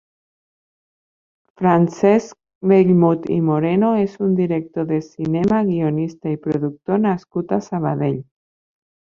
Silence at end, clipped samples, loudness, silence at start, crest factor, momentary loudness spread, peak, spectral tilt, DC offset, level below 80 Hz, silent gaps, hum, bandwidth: 0.8 s; under 0.1%; -19 LUFS; 1.6 s; 18 dB; 8 LU; -2 dBFS; -9 dB/octave; under 0.1%; -58 dBFS; 2.55-2.61 s; none; 7.2 kHz